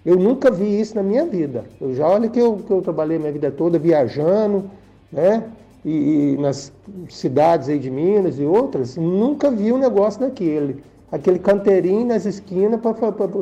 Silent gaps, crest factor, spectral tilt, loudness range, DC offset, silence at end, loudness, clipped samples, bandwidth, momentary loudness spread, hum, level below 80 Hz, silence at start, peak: none; 12 dB; -8 dB/octave; 2 LU; under 0.1%; 0 s; -18 LUFS; under 0.1%; 8.6 kHz; 10 LU; none; -56 dBFS; 0.05 s; -6 dBFS